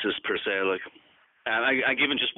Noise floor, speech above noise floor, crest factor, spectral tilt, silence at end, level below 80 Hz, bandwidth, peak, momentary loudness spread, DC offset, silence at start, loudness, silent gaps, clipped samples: -59 dBFS; 33 dB; 16 dB; 0 dB/octave; 0.05 s; -68 dBFS; 4.2 kHz; -12 dBFS; 11 LU; under 0.1%; 0 s; -25 LUFS; none; under 0.1%